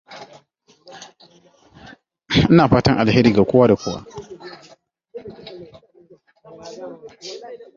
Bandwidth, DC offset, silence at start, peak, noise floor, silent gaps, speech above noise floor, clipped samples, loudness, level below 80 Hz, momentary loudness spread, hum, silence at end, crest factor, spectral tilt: 7.4 kHz; under 0.1%; 0.1 s; -2 dBFS; -56 dBFS; none; 42 dB; under 0.1%; -15 LUFS; -44 dBFS; 26 LU; none; 0.2 s; 20 dB; -7 dB/octave